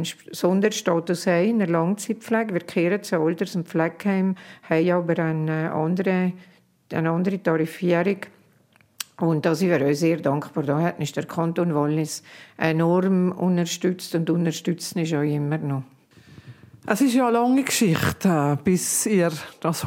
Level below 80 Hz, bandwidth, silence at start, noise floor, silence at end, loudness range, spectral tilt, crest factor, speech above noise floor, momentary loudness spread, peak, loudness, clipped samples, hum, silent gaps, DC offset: -62 dBFS; 16.5 kHz; 0 s; -59 dBFS; 0 s; 3 LU; -5.5 dB/octave; 20 dB; 37 dB; 7 LU; -2 dBFS; -23 LUFS; under 0.1%; none; none; under 0.1%